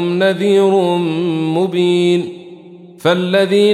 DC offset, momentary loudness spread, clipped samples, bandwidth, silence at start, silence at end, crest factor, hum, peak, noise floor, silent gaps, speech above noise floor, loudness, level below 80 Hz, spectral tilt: under 0.1%; 7 LU; under 0.1%; 13.5 kHz; 0 s; 0 s; 12 dB; none; -2 dBFS; -37 dBFS; none; 24 dB; -14 LUFS; -66 dBFS; -6.5 dB/octave